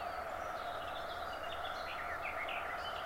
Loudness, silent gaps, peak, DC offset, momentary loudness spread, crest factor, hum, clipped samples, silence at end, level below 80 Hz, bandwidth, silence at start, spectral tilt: -41 LUFS; none; -28 dBFS; under 0.1%; 3 LU; 14 dB; none; under 0.1%; 0 s; -60 dBFS; 16 kHz; 0 s; -3 dB/octave